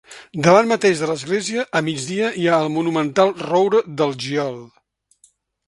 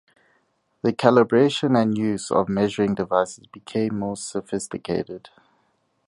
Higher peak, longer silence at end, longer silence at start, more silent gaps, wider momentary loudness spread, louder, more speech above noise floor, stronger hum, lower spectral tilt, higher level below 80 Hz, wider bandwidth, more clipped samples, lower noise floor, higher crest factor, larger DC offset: about the same, 0 dBFS vs 0 dBFS; about the same, 1 s vs 0.9 s; second, 0.1 s vs 0.85 s; neither; second, 9 LU vs 12 LU; first, -19 LUFS vs -22 LUFS; second, 40 dB vs 46 dB; neither; about the same, -5 dB/octave vs -5.5 dB/octave; about the same, -62 dBFS vs -58 dBFS; about the same, 11.5 kHz vs 11.5 kHz; neither; second, -58 dBFS vs -68 dBFS; about the same, 20 dB vs 22 dB; neither